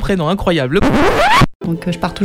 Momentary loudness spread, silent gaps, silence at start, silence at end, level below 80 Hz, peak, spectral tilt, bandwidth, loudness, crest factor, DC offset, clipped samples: 9 LU; 1.55-1.60 s; 0 s; 0 s; -26 dBFS; -2 dBFS; -5.5 dB/octave; 16.5 kHz; -14 LUFS; 12 dB; under 0.1%; under 0.1%